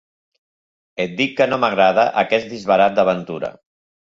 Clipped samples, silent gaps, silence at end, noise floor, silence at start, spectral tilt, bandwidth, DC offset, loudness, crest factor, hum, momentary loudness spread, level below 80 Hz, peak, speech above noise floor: under 0.1%; none; 0.55 s; under -90 dBFS; 1 s; -5.5 dB/octave; 7.6 kHz; under 0.1%; -17 LUFS; 16 dB; none; 13 LU; -60 dBFS; -2 dBFS; over 73 dB